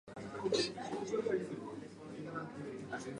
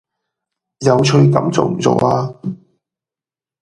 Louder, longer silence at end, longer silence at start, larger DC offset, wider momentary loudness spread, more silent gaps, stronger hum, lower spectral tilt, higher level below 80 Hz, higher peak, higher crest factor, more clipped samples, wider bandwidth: second, -40 LUFS vs -14 LUFS; second, 0 s vs 1.05 s; second, 0.05 s vs 0.8 s; neither; second, 13 LU vs 16 LU; neither; neither; second, -4.5 dB/octave vs -6.5 dB/octave; second, -72 dBFS vs -52 dBFS; second, -20 dBFS vs 0 dBFS; about the same, 20 dB vs 16 dB; neither; about the same, 11 kHz vs 10.5 kHz